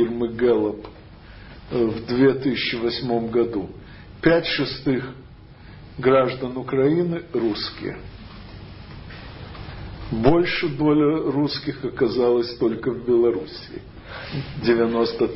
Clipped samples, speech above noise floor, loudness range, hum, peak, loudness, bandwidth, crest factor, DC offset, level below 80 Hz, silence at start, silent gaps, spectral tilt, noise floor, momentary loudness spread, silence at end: under 0.1%; 22 dB; 5 LU; none; -2 dBFS; -22 LUFS; 5.8 kHz; 20 dB; under 0.1%; -46 dBFS; 0 s; none; -10.5 dB/octave; -43 dBFS; 21 LU; 0 s